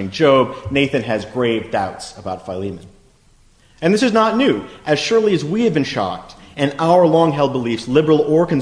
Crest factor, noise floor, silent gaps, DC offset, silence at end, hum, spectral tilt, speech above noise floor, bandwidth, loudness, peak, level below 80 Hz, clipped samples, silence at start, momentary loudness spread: 16 dB; -52 dBFS; none; under 0.1%; 0 s; none; -6 dB/octave; 35 dB; 10.5 kHz; -17 LUFS; 0 dBFS; -50 dBFS; under 0.1%; 0 s; 13 LU